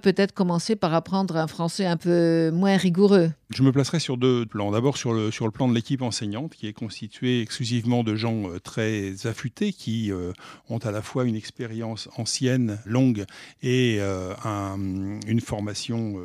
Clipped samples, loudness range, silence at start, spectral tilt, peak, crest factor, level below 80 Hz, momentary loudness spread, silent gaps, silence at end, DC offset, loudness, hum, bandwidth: under 0.1%; 7 LU; 0.05 s; -6 dB/octave; -6 dBFS; 18 dB; -60 dBFS; 11 LU; none; 0 s; under 0.1%; -25 LUFS; none; 14 kHz